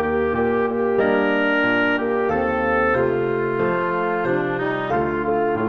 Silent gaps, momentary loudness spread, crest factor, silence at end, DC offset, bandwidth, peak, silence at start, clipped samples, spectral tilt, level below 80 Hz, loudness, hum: none; 3 LU; 14 dB; 0 s; 0.3%; 6.4 kHz; -6 dBFS; 0 s; under 0.1%; -8 dB/octave; -48 dBFS; -20 LUFS; none